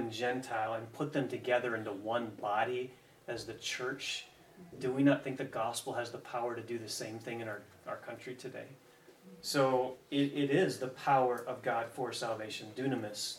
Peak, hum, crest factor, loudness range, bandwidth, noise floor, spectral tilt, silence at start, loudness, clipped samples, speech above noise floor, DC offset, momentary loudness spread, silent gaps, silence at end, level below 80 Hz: -16 dBFS; none; 20 dB; 7 LU; 16 kHz; -58 dBFS; -4.5 dB/octave; 0 s; -36 LUFS; under 0.1%; 22 dB; under 0.1%; 15 LU; none; 0 s; -78 dBFS